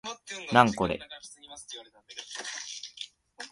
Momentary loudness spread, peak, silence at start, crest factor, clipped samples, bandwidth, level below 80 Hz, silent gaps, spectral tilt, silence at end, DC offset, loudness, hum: 22 LU; -4 dBFS; 0.05 s; 26 dB; under 0.1%; 11.5 kHz; -60 dBFS; none; -4 dB/octave; 0 s; under 0.1%; -28 LUFS; none